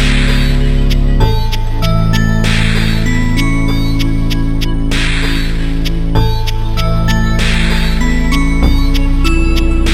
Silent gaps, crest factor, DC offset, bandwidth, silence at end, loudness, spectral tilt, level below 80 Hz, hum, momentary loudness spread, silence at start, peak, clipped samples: none; 10 dB; under 0.1%; 14 kHz; 0 s; -14 LUFS; -5.5 dB/octave; -12 dBFS; none; 4 LU; 0 s; 0 dBFS; under 0.1%